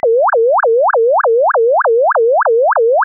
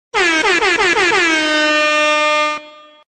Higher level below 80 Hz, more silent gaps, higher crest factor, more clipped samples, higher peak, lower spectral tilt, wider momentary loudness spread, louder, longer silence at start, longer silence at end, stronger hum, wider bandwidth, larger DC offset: second, -66 dBFS vs -50 dBFS; neither; second, 4 dB vs 12 dB; neither; about the same, -6 dBFS vs -4 dBFS; second, 8.5 dB/octave vs -1 dB/octave; second, 0 LU vs 3 LU; about the same, -11 LUFS vs -13 LUFS; about the same, 0.05 s vs 0.15 s; second, 0 s vs 0.4 s; neither; second, 1.9 kHz vs 12.5 kHz; neither